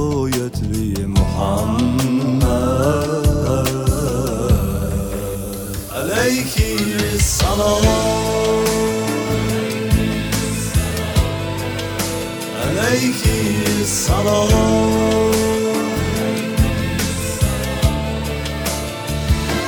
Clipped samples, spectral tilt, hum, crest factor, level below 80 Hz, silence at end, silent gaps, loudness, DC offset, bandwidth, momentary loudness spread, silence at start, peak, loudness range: under 0.1%; -5 dB/octave; none; 14 dB; -26 dBFS; 0 s; none; -18 LUFS; under 0.1%; over 20 kHz; 7 LU; 0 s; -2 dBFS; 3 LU